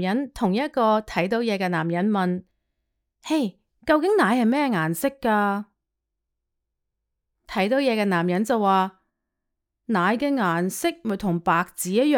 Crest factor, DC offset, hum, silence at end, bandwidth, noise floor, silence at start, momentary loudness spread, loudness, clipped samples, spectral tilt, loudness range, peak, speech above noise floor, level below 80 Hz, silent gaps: 18 dB; under 0.1%; none; 0 s; 19 kHz; -82 dBFS; 0 s; 7 LU; -23 LUFS; under 0.1%; -5.5 dB/octave; 3 LU; -6 dBFS; 60 dB; -58 dBFS; none